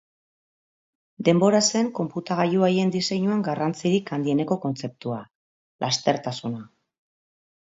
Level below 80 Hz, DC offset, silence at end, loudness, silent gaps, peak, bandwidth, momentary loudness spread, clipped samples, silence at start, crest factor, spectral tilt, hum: -68 dBFS; under 0.1%; 1.05 s; -24 LUFS; 5.35-5.79 s; -6 dBFS; 8 kHz; 12 LU; under 0.1%; 1.2 s; 20 dB; -5 dB/octave; none